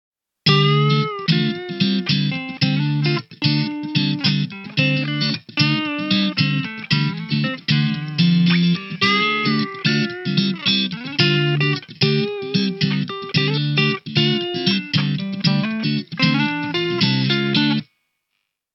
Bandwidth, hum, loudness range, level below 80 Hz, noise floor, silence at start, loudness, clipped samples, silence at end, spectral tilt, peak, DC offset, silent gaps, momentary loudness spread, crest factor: 6.6 kHz; none; 2 LU; -64 dBFS; -75 dBFS; 0.45 s; -19 LUFS; under 0.1%; 0.9 s; -6.5 dB/octave; -2 dBFS; under 0.1%; none; 5 LU; 16 dB